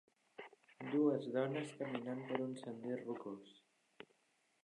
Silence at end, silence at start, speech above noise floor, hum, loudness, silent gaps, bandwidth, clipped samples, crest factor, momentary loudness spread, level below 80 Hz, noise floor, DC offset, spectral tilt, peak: 1.05 s; 0.4 s; 38 dB; none; -42 LUFS; none; 11 kHz; under 0.1%; 22 dB; 25 LU; under -90 dBFS; -79 dBFS; under 0.1%; -7 dB/octave; -22 dBFS